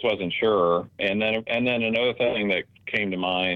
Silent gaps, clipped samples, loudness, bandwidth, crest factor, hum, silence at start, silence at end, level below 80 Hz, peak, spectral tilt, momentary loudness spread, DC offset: none; under 0.1%; -24 LUFS; 6.4 kHz; 16 dB; none; 0 s; 0 s; -60 dBFS; -8 dBFS; -7 dB/octave; 4 LU; under 0.1%